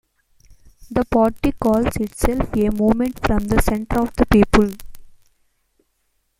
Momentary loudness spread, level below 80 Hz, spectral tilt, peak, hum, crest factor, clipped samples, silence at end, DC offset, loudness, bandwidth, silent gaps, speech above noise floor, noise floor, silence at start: 7 LU; -30 dBFS; -6.5 dB/octave; 0 dBFS; none; 20 dB; under 0.1%; 1.3 s; under 0.1%; -19 LUFS; 16.5 kHz; none; 50 dB; -68 dBFS; 0.8 s